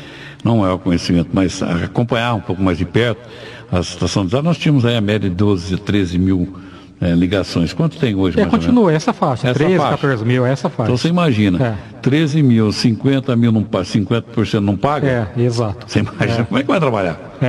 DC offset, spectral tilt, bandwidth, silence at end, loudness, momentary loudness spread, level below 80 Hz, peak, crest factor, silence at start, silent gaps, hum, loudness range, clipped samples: under 0.1%; -7 dB/octave; 12 kHz; 0 s; -16 LUFS; 6 LU; -36 dBFS; -2 dBFS; 14 dB; 0 s; none; none; 2 LU; under 0.1%